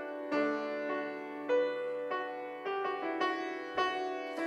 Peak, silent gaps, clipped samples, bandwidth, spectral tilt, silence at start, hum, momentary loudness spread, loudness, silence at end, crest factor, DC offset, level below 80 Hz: -18 dBFS; none; under 0.1%; 11.5 kHz; -4 dB/octave; 0 s; none; 6 LU; -35 LUFS; 0 s; 16 dB; under 0.1%; -80 dBFS